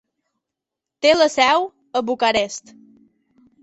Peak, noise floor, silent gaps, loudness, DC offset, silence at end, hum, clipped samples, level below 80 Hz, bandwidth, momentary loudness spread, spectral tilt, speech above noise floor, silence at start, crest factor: -2 dBFS; -84 dBFS; none; -18 LUFS; under 0.1%; 1.05 s; none; under 0.1%; -60 dBFS; 8.2 kHz; 11 LU; -2 dB/octave; 67 dB; 1 s; 18 dB